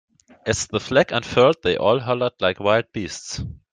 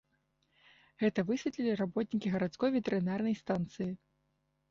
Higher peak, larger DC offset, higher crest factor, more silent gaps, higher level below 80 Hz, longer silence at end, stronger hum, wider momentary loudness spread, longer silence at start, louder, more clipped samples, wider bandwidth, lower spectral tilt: first, -2 dBFS vs -20 dBFS; neither; about the same, 18 dB vs 16 dB; neither; first, -48 dBFS vs -68 dBFS; second, 0.2 s vs 0.75 s; neither; first, 13 LU vs 6 LU; second, 0.45 s vs 1 s; first, -21 LUFS vs -34 LUFS; neither; first, 9.8 kHz vs 7.4 kHz; second, -4 dB/octave vs -7 dB/octave